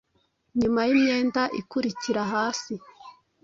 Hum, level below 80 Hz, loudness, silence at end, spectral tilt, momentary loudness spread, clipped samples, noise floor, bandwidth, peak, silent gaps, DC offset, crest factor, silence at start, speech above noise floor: none; -60 dBFS; -25 LUFS; 0.3 s; -4.5 dB/octave; 11 LU; under 0.1%; -70 dBFS; 7.8 kHz; -10 dBFS; none; under 0.1%; 16 dB; 0.55 s; 45 dB